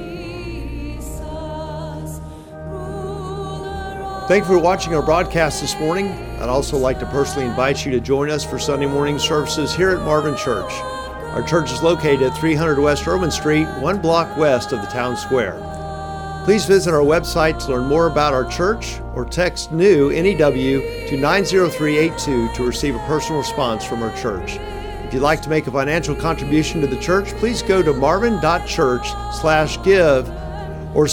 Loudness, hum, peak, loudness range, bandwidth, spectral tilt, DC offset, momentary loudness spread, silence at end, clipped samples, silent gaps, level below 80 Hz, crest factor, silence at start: -18 LUFS; none; -2 dBFS; 4 LU; 18.5 kHz; -5 dB/octave; under 0.1%; 13 LU; 0 s; under 0.1%; none; -34 dBFS; 16 dB; 0 s